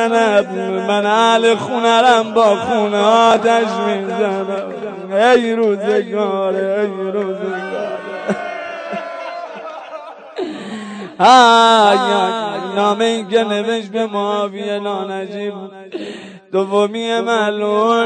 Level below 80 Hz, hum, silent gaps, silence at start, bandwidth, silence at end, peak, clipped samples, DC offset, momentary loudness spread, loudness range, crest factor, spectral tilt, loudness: -64 dBFS; none; none; 0 s; 9.4 kHz; 0 s; 0 dBFS; under 0.1%; under 0.1%; 17 LU; 10 LU; 14 dB; -4 dB/octave; -15 LUFS